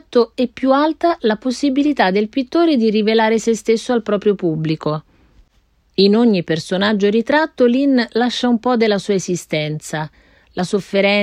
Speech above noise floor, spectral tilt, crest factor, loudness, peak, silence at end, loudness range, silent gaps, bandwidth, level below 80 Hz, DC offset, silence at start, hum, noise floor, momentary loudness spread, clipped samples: 42 dB; -5.5 dB/octave; 14 dB; -17 LUFS; -2 dBFS; 0 s; 3 LU; none; 12.5 kHz; -54 dBFS; under 0.1%; 0.1 s; none; -58 dBFS; 7 LU; under 0.1%